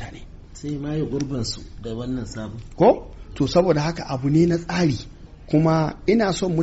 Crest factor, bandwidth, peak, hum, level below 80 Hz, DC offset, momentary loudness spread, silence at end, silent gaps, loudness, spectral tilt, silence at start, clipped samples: 16 dB; 8 kHz; -6 dBFS; none; -40 dBFS; under 0.1%; 15 LU; 0 s; none; -22 LUFS; -6.5 dB/octave; 0 s; under 0.1%